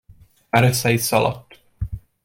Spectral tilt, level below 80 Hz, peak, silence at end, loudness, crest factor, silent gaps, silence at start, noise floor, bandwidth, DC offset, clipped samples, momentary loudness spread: -4.5 dB/octave; -40 dBFS; -2 dBFS; 0.25 s; -19 LUFS; 20 dB; none; 0.55 s; -50 dBFS; 16.5 kHz; under 0.1%; under 0.1%; 15 LU